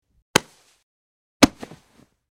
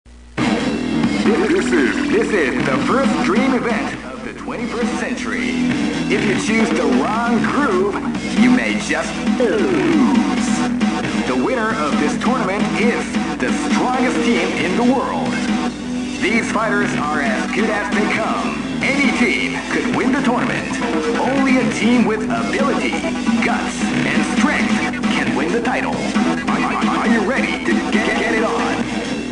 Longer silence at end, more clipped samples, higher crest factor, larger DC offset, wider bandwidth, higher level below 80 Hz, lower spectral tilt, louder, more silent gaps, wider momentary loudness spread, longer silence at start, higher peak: first, 0.85 s vs 0 s; neither; first, 26 dB vs 14 dB; second, under 0.1% vs 0.2%; first, 16 kHz vs 10.5 kHz; about the same, -46 dBFS vs -42 dBFS; second, -3 dB/octave vs -5 dB/octave; second, -20 LUFS vs -17 LUFS; first, 0.83-1.40 s vs none; first, 24 LU vs 5 LU; first, 0.35 s vs 0.05 s; about the same, 0 dBFS vs -2 dBFS